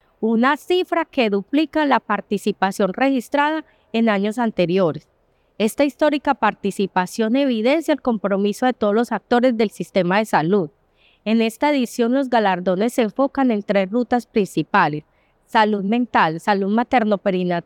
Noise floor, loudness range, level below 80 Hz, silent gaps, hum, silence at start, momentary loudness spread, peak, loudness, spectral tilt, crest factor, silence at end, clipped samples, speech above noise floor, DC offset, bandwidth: -58 dBFS; 1 LU; -60 dBFS; none; none; 0.2 s; 4 LU; -4 dBFS; -19 LUFS; -6 dB/octave; 16 dB; 0.05 s; under 0.1%; 39 dB; under 0.1%; 17 kHz